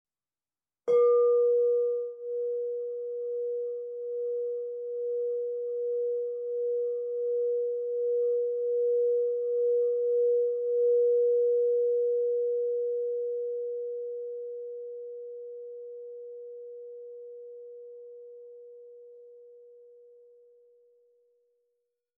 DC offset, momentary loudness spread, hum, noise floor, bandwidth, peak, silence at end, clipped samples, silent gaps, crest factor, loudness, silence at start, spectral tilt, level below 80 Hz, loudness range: under 0.1%; 20 LU; none; under -90 dBFS; 2.3 kHz; -16 dBFS; 2.3 s; under 0.1%; none; 14 dB; -29 LUFS; 0.85 s; -4.5 dB/octave; under -90 dBFS; 19 LU